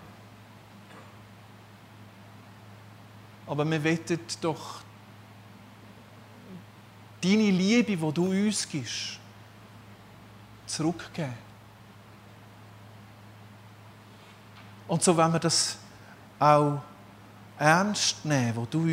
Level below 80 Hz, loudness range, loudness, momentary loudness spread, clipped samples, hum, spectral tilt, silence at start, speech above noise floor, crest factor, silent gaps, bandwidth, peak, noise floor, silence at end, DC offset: -68 dBFS; 17 LU; -26 LUFS; 27 LU; under 0.1%; none; -4.5 dB/octave; 0 s; 25 dB; 26 dB; none; 16 kHz; -4 dBFS; -51 dBFS; 0 s; under 0.1%